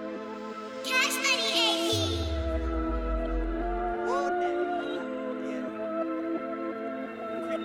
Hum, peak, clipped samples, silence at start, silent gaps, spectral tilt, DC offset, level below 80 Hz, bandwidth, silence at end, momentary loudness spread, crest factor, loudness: none; -12 dBFS; under 0.1%; 0 s; none; -3.5 dB/octave; under 0.1%; -38 dBFS; 18 kHz; 0 s; 12 LU; 18 dB; -29 LUFS